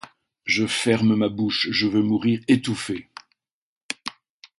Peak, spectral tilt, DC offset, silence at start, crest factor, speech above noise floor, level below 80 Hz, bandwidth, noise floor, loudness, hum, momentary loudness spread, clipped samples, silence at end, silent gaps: -4 dBFS; -5 dB/octave; under 0.1%; 0.45 s; 20 dB; 51 dB; -58 dBFS; 11.5 kHz; -72 dBFS; -22 LUFS; none; 13 LU; under 0.1%; 0.5 s; 3.52-3.89 s